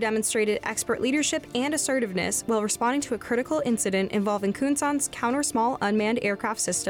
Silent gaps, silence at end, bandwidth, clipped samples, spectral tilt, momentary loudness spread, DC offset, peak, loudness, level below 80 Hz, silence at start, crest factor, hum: none; 0 s; 19 kHz; under 0.1%; -3.5 dB/octave; 3 LU; under 0.1%; -14 dBFS; -25 LUFS; -58 dBFS; 0 s; 10 dB; none